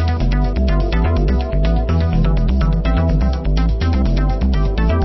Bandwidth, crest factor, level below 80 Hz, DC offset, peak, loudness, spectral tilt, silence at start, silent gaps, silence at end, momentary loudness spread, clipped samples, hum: 6 kHz; 10 dB; -16 dBFS; under 0.1%; -4 dBFS; -17 LUFS; -8.5 dB/octave; 0 s; none; 0 s; 1 LU; under 0.1%; none